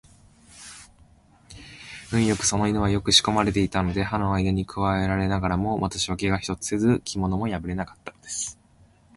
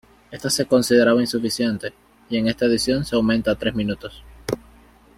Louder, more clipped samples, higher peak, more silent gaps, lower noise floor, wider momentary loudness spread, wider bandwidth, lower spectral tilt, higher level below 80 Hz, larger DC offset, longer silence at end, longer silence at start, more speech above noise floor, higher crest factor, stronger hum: second, -24 LUFS vs -21 LUFS; neither; about the same, -2 dBFS vs -2 dBFS; neither; first, -57 dBFS vs -50 dBFS; first, 20 LU vs 15 LU; second, 11.5 kHz vs 16 kHz; about the same, -4.5 dB/octave vs -4.5 dB/octave; about the same, -42 dBFS vs -46 dBFS; neither; about the same, 0.65 s vs 0.6 s; first, 0.55 s vs 0.3 s; about the same, 33 dB vs 30 dB; about the same, 22 dB vs 18 dB; neither